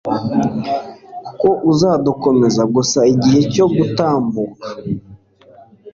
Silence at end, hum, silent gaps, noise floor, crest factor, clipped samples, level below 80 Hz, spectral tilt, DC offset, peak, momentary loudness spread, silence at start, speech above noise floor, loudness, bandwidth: 0.05 s; none; none; -45 dBFS; 14 dB; under 0.1%; -48 dBFS; -6 dB/octave; under 0.1%; -2 dBFS; 13 LU; 0.05 s; 31 dB; -15 LUFS; 7.6 kHz